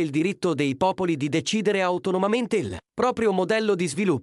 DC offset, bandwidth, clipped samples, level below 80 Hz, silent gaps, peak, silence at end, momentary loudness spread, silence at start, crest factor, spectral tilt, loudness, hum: under 0.1%; 12 kHz; under 0.1%; -58 dBFS; none; -10 dBFS; 0 s; 3 LU; 0 s; 14 dB; -5.5 dB/octave; -24 LUFS; none